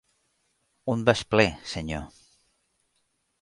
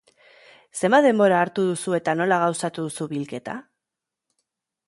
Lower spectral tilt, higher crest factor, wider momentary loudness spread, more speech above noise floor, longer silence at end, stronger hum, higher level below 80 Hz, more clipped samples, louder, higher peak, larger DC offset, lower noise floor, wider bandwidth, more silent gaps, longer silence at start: about the same, -5 dB/octave vs -5 dB/octave; first, 24 dB vs 18 dB; about the same, 14 LU vs 16 LU; second, 49 dB vs 65 dB; about the same, 1.35 s vs 1.25 s; neither; first, -50 dBFS vs -72 dBFS; neither; second, -26 LUFS vs -22 LUFS; about the same, -4 dBFS vs -6 dBFS; neither; second, -74 dBFS vs -86 dBFS; about the same, 11.5 kHz vs 11.5 kHz; neither; about the same, 0.85 s vs 0.75 s